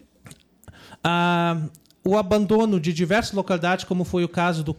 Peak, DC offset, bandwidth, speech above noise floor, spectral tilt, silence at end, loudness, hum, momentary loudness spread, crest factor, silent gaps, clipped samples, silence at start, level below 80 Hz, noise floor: -12 dBFS; under 0.1%; 14.5 kHz; 28 dB; -6 dB/octave; 0.05 s; -22 LUFS; none; 6 LU; 12 dB; none; under 0.1%; 0.25 s; -50 dBFS; -49 dBFS